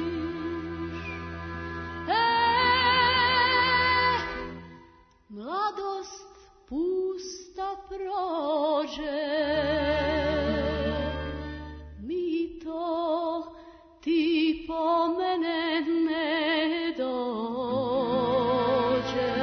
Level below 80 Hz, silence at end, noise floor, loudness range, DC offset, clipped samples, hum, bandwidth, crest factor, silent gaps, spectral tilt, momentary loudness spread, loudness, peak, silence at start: -48 dBFS; 0 s; -56 dBFS; 9 LU; under 0.1%; under 0.1%; none; 6.6 kHz; 16 dB; none; -5.5 dB/octave; 15 LU; -27 LUFS; -10 dBFS; 0 s